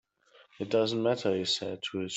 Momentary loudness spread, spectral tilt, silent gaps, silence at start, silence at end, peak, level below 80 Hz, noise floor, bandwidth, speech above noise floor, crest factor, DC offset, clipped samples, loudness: 7 LU; -4.5 dB/octave; none; 0.6 s; 0 s; -14 dBFS; -74 dBFS; -62 dBFS; 8.4 kHz; 32 dB; 16 dB; under 0.1%; under 0.1%; -30 LUFS